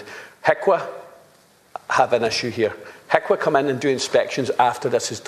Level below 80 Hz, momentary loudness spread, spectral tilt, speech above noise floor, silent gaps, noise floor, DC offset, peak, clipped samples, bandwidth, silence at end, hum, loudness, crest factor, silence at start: -64 dBFS; 17 LU; -4 dB/octave; 34 dB; none; -54 dBFS; under 0.1%; 0 dBFS; under 0.1%; 14 kHz; 0 s; none; -20 LUFS; 22 dB; 0 s